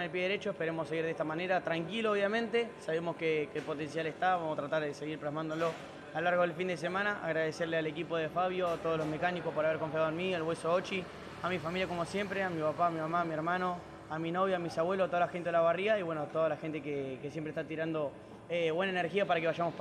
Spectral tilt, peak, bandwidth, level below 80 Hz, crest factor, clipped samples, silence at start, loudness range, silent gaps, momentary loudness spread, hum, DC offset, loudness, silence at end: -6 dB/octave; -18 dBFS; 12.5 kHz; -68 dBFS; 16 dB; under 0.1%; 0 s; 2 LU; none; 7 LU; none; under 0.1%; -34 LUFS; 0 s